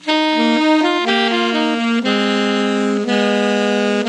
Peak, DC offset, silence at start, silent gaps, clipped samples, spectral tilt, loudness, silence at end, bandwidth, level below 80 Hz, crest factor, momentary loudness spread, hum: -2 dBFS; under 0.1%; 0 s; none; under 0.1%; -4.5 dB/octave; -16 LUFS; 0 s; 10.5 kHz; -72 dBFS; 14 dB; 3 LU; none